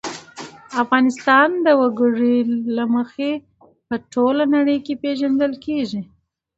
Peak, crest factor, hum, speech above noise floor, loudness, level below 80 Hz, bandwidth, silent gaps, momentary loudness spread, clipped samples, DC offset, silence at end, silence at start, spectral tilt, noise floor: 0 dBFS; 18 dB; none; 20 dB; -18 LUFS; -62 dBFS; 8 kHz; none; 14 LU; under 0.1%; under 0.1%; 0.55 s; 0.05 s; -5 dB/octave; -38 dBFS